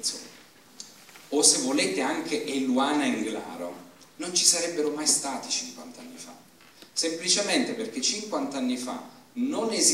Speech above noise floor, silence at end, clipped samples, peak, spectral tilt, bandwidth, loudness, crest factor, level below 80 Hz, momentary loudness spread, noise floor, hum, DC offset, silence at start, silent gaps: 26 dB; 0 s; under 0.1%; -4 dBFS; -1 dB/octave; 16 kHz; -25 LUFS; 24 dB; -78 dBFS; 22 LU; -53 dBFS; none; under 0.1%; 0 s; none